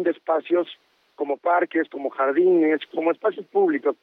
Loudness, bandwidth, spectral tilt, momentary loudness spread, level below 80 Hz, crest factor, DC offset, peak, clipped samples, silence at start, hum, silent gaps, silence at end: -22 LUFS; 4.1 kHz; -8 dB/octave; 9 LU; -88 dBFS; 12 dB; under 0.1%; -10 dBFS; under 0.1%; 0 s; none; none; 0.1 s